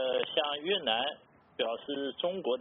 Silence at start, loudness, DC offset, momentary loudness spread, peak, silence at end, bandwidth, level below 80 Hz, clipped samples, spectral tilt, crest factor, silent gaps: 0 s; -32 LUFS; under 0.1%; 7 LU; -14 dBFS; 0 s; 4.1 kHz; -76 dBFS; under 0.1%; -0.5 dB/octave; 18 dB; none